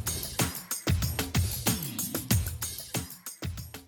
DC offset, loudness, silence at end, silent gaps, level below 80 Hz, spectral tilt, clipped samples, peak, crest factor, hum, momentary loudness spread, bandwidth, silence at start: under 0.1%; -31 LUFS; 0 s; none; -42 dBFS; -3.5 dB/octave; under 0.1%; -12 dBFS; 20 dB; none; 10 LU; over 20 kHz; 0 s